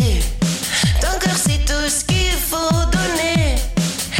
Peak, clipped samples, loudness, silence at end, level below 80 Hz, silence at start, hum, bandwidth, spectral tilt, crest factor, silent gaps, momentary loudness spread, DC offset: -6 dBFS; under 0.1%; -18 LUFS; 0 s; -22 dBFS; 0 s; none; 17 kHz; -3.5 dB/octave; 10 dB; none; 3 LU; under 0.1%